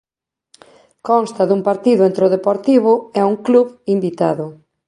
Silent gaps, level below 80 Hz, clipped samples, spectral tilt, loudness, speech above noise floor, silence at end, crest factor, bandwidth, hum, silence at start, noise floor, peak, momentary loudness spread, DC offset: none; -66 dBFS; under 0.1%; -7.5 dB/octave; -15 LUFS; 66 dB; 0.35 s; 14 dB; 11 kHz; none; 1.05 s; -81 dBFS; -2 dBFS; 6 LU; under 0.1%